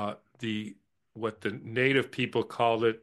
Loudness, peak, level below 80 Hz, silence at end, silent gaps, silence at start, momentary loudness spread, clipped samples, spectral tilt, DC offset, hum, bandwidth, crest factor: -30 LUFS; -10 dBFS; -70 dBFS; 0.05 s; none; 0 s; 11 LU; under 0.1%; -6 dB/octave; under 0.1%; none; 12.5 kHz; 20 dB